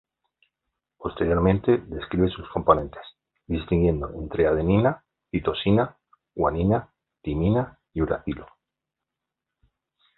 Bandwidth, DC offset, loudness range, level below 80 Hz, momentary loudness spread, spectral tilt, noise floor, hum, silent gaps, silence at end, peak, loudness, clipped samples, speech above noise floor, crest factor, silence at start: 4.2 kHz; under 0.1%; 3 LU; -40 dBFS; 14 LU; -11.5 dB/octave; -86 dBFS; none; none; 1.75 s; -4 dBFS; -24 LUFS; under 0.1%; 63 dB; 22 dB; 1 s